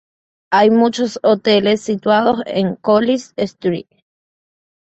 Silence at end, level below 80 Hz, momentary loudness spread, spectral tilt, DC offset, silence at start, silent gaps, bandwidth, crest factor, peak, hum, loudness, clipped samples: 1.05 s; -58 dBFS; 8 LU; -5.5 dB/octave; under 0.1%; 0.5 s; none; 8.2 kHz; 14 dB; -2 dBFS; none; -16 LUFS; under 0.1%